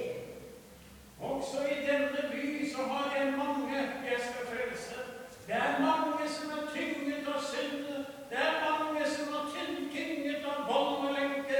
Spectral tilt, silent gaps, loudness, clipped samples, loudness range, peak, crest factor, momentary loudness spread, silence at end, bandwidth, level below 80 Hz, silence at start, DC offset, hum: -3.5 dB/octave; none; -34 LUFS; under 0.1%; 1 LU; -16 dBFS; 18 dB; 12 LU; 0 s; 19 kHz; -68 dBFS; 0 s; under 0.1%; none